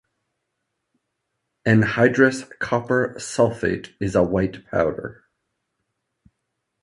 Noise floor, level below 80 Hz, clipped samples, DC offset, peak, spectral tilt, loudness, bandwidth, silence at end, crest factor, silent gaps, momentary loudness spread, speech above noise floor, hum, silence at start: -78 dBFS; -48 dBFS; under 0.1%; under 0.1%; -2 dBFS; -6.5 dB/octave; -21 LUFS; 11.5 kHz; 1.7 s; 20 dB; none; 11 LU; 57 dB; none; 1.65 s